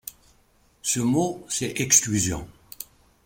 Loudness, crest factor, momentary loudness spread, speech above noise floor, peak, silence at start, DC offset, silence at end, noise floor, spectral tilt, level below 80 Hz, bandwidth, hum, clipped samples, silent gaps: -22 LUFS; 24 dB; 22 LU; 37 dB; -2 dBFS; 0.05 s; under 0.1%; 0.45 s; -61 dBFS; -3 dB/octave; -52 dBFS; 16.5 kHz; none; under 0.1%; none